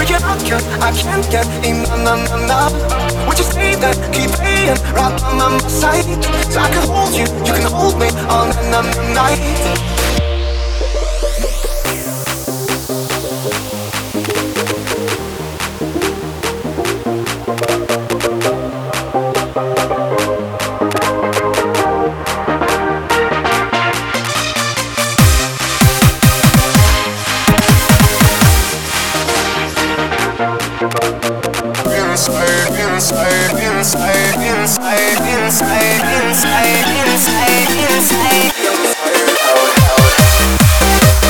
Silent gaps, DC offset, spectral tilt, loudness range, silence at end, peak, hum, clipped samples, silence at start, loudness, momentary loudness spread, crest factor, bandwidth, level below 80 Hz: none; under 0.1%; -4 dB/octave; 8 LU; 0 s; 0 dBFS; none; under 0.1%; 0 s; -13 LUFS; 9 LU; 14 dB; over 20 kHz; -22 dBFS